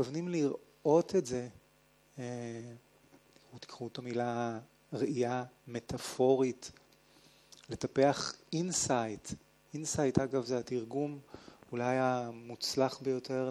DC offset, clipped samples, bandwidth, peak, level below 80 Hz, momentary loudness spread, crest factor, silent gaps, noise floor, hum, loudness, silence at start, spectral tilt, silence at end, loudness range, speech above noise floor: under 0.1%; under 0.1%; 14 kHz; -12 dBFS; -66 dBFS; 17 LU; 24 dB; none; -67 dBFS; none; -34 LUFS; 0 s; -5 dB/octave; 0 s; 7 LU; 33 dB